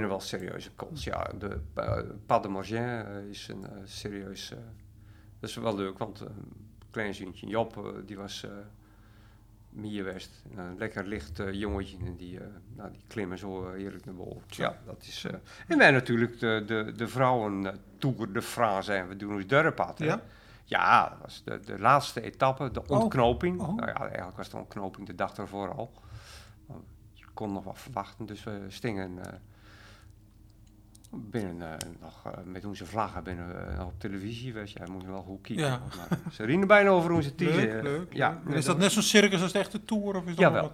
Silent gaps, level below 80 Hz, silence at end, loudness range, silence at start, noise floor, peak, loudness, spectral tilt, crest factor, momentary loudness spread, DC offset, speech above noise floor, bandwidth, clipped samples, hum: none; -54 dBFS; 0 s; 14 LU; 0 s; -55 dBFS; -6 dBFS; -30 LUFS; -5 dB/octave; 26 dB; 20 LU; under 0.1%; 25 dB; 16.5 kHz; under 0.1%; none